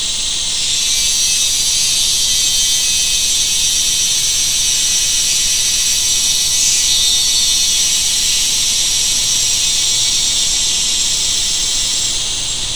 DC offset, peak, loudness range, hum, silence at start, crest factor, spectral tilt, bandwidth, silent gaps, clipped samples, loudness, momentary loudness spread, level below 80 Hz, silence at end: 4%; 0 dBFS; 1 LU; none; 0 s; 14 dB; 2 dB/octave; over 20 kHz; none; under 0.1%; -11 LUFS; 3 LU; -34 dBFS; 0 s